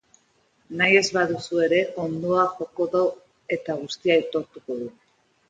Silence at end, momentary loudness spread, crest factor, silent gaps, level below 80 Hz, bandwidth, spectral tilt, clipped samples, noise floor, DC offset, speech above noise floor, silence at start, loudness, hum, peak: 0.6 s; 15 LU; 20 dB; none; -66 dBFS; 9.2 kHz; -4.5 dB/octave; under 0.1%; -64 dBFS; under 0.1%; 41 dB; 0.7 s; -23 LUFS; none; -4 dBFS